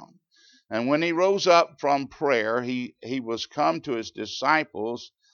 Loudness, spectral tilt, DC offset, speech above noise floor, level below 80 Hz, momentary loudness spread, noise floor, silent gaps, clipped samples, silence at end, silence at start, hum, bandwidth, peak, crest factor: -25 LUFS; -4.5 dB/octave; under 0.1%; 35 dB; -70 dBFS; 12 LU; -60 dBFS; none; under 0.1%; 0.25 s; 0 s; none; 7.2 kHz; -6 dBFS; 20 dB